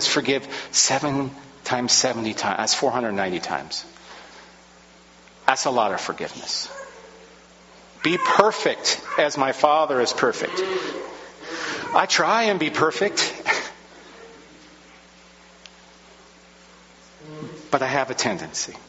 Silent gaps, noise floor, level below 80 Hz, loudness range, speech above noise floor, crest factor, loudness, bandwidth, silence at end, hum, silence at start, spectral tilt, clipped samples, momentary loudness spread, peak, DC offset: none; -50 dBFS; -62 dBFS; 7 LU; 28 dB; 24 dB; -22 LUFS; 8 kHz; 0.05 s; none; 0 s; -1.5 dB/octave; under 0.1%; 19 LU; 0 dBFS; under 0.1%